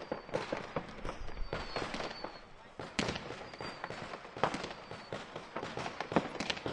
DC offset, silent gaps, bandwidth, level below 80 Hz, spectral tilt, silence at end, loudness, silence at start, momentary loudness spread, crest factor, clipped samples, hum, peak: under 0.1%; none; 11.5 kHz; -52 dBFS; -4.5 dB/octave; 0 s; -40 LUFS; 0 s; 10 LU; 30 dB; under 0.1%; none; -10 dBFS